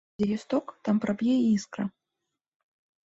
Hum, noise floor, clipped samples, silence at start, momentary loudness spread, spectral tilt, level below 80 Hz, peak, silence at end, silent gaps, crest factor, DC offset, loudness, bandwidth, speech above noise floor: none; -85 dBFS; under 0.1%; 0.2 s; 10 LU; -6.5 dB/octave; -66 dBFS; -12 dBFS; 1.15 s; none; 16 dB; under 0.1%; -28 LUFS; 8 kHz; 58 dB